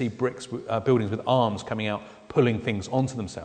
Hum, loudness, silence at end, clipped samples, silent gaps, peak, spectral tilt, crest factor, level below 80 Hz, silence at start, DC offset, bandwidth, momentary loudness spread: none; -26 LUFS; 0 s; under 0.1%; none; -8 dBFS; -6.5 dB/octave; 18 dB; -58 dBFS; 0 s; under 0.1%; 9.4 kHz; 7 LU